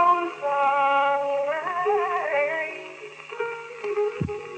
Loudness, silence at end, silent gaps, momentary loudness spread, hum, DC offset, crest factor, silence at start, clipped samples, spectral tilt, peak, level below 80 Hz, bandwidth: -25 LUFS; 0 s; none; 12 LU; none; under 0.1%; 14 dB; 0 s; under 0.1%; -5.5 dB/octave; -10 dBFS; -60 dBFS; 8.8 kHz